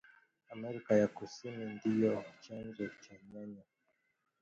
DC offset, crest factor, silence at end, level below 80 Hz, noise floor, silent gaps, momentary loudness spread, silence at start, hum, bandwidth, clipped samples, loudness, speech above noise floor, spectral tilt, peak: under 0.1%; 22 dB; 0.8 s; -76 dBFS; -80 dBFS; none; 21 LU; 0.5 s; none; 7.4 kHz; under 0.1%; -37 LUFS; 43 dB; -7 dB/octave; -16 dBFS